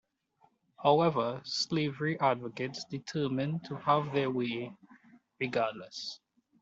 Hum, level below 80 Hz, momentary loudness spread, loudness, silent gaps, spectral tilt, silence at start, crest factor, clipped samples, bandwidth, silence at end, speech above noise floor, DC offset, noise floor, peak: none; -74 dBFS; 13 LU; -32 LUFS; none; -5.5 dB/octave; 0.8 s; 22 dB; under 0.1%; 8 kHz; 0.45 s; 38 dB; under 0.1%; -70 dBFS; -10 dBFS